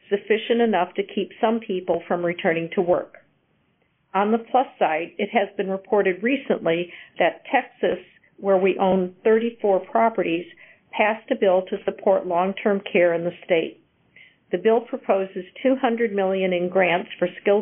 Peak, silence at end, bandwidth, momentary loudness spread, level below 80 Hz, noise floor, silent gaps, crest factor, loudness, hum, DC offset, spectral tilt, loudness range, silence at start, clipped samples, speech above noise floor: -6 dBFS; 0 s; 3.8 kHz; 7 LU; -68 dBFS; -66 dBFS; none; 18 dB; -22 LUFS; none; under 0.1%; -1.5 dB/octave; 2 LU; 0.1 s; under 0.1%; 45 dB